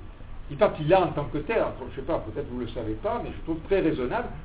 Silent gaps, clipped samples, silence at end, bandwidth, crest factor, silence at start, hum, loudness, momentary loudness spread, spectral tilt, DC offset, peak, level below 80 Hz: none; under 0.1%; 0 s; 4 kHz; 20 dB; 0 s; none; -27 LUFS; 12 LU; -10.5 dB/octave; 0.1%; -6 dBFS; -42 dBFS